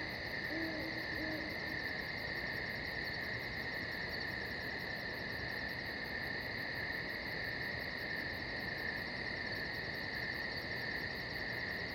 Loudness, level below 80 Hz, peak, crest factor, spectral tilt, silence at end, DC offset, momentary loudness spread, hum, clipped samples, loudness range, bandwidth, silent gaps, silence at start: -40 LUFS; -58 dBFS; -28 dBFS; 14 dB; -5 dB/octave; 0 s; under 0.1%; 1 LU; none; under 0.1%; 1 LU; 18 kHz; none; 0 s